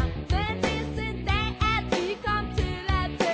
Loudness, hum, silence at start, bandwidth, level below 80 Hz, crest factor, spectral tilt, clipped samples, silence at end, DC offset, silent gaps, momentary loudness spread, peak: -27 LUFS; none; 0 s; 8 kHz; -32 dBFS; 14 dB; -5.5 dB/octave; under 0.1%; 0 s; under 0.1%; none; 4 LU; -12 dBFS